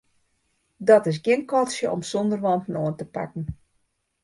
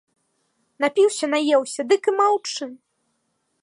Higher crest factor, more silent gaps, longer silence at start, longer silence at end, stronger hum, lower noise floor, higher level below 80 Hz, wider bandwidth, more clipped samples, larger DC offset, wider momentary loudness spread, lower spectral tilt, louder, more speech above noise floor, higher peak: about the same, 20 dB vs 16 dB; neither; about the same, 0.8 s vs 0.8 s; second, 0.7 s vs 0.85 s; neither; about the same, -71 dBFS vs -72 dBFS; first, -54 dBFS vs -82 dBFS; about the same, 11.5 kHz vs 11.5 kHz; neither; neither; first, 14 LU vs 10 LU; first, -6 dB/octave vs -1.5 dB/octave; about the same, -23 LUFS vs -21 LUFS; about the same, 49 dB vs 52 dB; about the same, -4 dBFS vs -6 dBFS